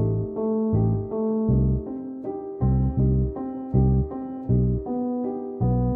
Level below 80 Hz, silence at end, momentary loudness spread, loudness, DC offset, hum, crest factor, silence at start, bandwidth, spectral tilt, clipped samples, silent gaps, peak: -32 dBFS; 0 s; 10 LU; -25 LUFS; under 0.1%; none; 14 dB; 0 s; 2 kHz; -15.5 dB/octave; under 0.1%; none; -10 dBFS